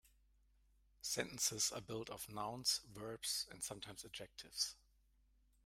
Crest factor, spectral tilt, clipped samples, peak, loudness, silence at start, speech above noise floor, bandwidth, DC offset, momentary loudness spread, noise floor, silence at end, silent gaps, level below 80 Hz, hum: 24 dB; -1.5 dB/octave; under 0.1%; -22 dBFS; -42 LUFS; 0.05 s; 29 dB; 16 kHz; under 0.1%; 13 LU; -74 dBFS; 0.9 s; none; -72 dBFS; none